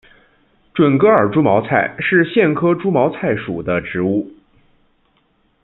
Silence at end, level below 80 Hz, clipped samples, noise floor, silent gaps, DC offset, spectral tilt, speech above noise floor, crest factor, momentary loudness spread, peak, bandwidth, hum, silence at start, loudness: 1.35 s; -54 dBFS; under 0.1%; -60 dBFS; none; under 0.1%; -11 dB/octave; 45 dB; 16 dB; 9 LU; -2 dBFS; 4.1 kHz; none; 0.75 s; -16 LUFS